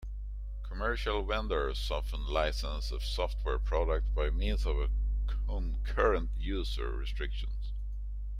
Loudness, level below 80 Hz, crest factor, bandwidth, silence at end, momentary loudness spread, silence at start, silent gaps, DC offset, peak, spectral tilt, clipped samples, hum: -34 LUFS; -32 dBFS; 16 dB; 10 kHz; 0 s; 9 LU; 0 s; none; under 0.1%; -16 dBFS; -6 dB/octave; under 0.1%; 50 Hz at -30 dBFS